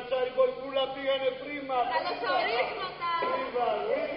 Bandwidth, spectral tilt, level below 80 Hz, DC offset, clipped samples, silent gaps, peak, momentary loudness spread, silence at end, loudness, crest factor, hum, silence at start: 5.6 kHz; -0.5 dB/octave; -64 dBFS; under 0.1%; under 0.1%; none; -14 dBFS; 5 LU; 0 s; -30 LUFS; 16 dB; none; 0 s